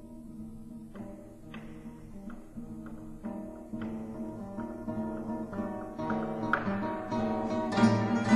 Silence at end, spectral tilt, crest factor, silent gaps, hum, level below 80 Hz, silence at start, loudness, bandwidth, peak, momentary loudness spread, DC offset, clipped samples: 0 s; -7 dB/octave; 22 dB; none; none; -54 dBFS; 0 s; -34 LUFS; 12 kHz; -12 dBFS; 18 LU; under 0.1%; under 0.1%